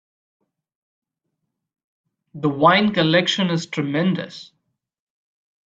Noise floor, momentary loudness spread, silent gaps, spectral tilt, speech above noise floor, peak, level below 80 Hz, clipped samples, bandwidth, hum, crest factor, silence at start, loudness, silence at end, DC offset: -78 dBFS; 12 LU; none; -5.5 dB/octave; 59 dB; 0 dBFS; -64 dBFS; under 0.1%; 7.8 kHz; none; 22 dB; 2.35 s; -19 LUFS; 1.25 s; under 0.1%